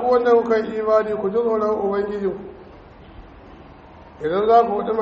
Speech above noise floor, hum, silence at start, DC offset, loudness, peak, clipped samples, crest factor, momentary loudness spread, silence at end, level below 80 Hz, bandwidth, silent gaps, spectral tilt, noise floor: 24 dB; none; 0 s; under 0.1%; -19 LUFS; -2 dBFS; under 0.1%; 18 dB; 11 LU; 0 s; -50 dBFS; 6.6 kHz; none; -5 dB/octave; -43 dBFS